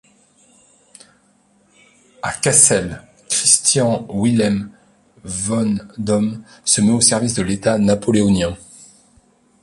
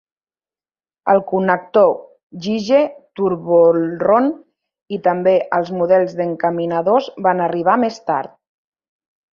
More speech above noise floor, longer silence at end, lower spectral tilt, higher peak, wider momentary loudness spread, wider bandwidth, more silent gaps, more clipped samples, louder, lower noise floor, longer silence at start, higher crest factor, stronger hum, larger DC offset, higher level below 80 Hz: second, 40 dB vs over 74 dB; about the same, 1.05 s vs 1.1 s; second, -3.5 dB/octave vs -7 dB/octave; about the same, 0 dBFS vs 0 dBFS; first, 14 LU vs 9 LU; first, 11.5 kHz vs 7 kHz; second, none vs 2.23-2.30 s, 4.82-4.86 s; neither; about the same, -16 LUFS vs -17 LUFS; second, -57 dBFS vs under -90 dBFS; first, 2.25 s vs 1.05 s; about the same, 18 dB vs 16 dB; neither; neither; first, -46 dBFS vs -62 dBFS